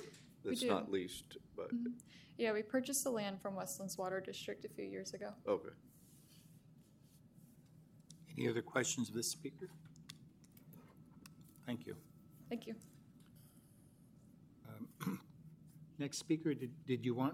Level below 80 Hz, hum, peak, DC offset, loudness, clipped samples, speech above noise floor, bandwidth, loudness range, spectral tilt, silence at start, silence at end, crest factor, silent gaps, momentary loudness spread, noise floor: -80 dBFS; none; -20 dBFS; under 0.1%; -42 LUFS; under 0.1%; 24 dB; 16.5 kHz; 11 LU; -4 dB/octave; 0 s; 0 s; 24 dB; none; 25 LU; -66 dBFS